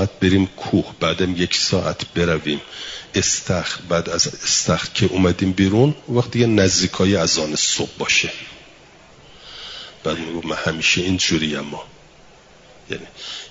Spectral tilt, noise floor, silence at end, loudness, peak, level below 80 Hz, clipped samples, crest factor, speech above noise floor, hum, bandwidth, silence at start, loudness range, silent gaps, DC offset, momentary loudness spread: -3.5 dB/octave; -47 dBFS; 0 s; -19 LUFS; -2 dBFS; -48 dBFS; under 0.1%; 18 dB; 28 dB; none; 7.8 kHz; 0 s; 5 LU; none; under 0.1%; 15 LU